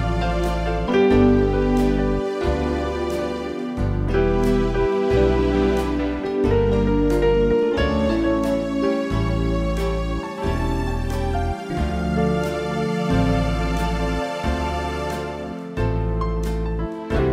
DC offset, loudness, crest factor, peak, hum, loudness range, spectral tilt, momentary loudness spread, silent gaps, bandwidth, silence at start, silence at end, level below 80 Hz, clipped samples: under 0.1%; -22 LUFS; 16 dB; -6 dBFS; none; 4 LU; -7.5 dB/octave; 7 LU; none; 15 kHz; 0 s; 0 s; -28 dBFS; under 0.1%